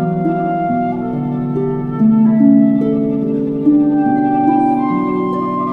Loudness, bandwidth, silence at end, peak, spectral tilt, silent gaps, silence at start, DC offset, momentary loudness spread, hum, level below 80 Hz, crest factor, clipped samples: -14 LUFS; 4.1 kHz; 0 s; 0 dBFS; -11 dB/octave; none; 0 s; under 0.1%; 8 LU; none; -48 dBFS; 14 dB; under 0.1%